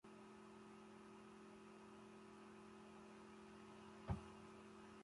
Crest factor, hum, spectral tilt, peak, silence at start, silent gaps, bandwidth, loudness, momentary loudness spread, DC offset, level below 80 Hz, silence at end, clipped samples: 26 dB; 60 Hz at -80 dBFS; -6.5 dB/octave; -32 dBFS; 0.05 s; none; 11.5 kHz; -59 LUFS; 10 LU; under 0.1%; -68 dBFS; 0 s; under 0.1%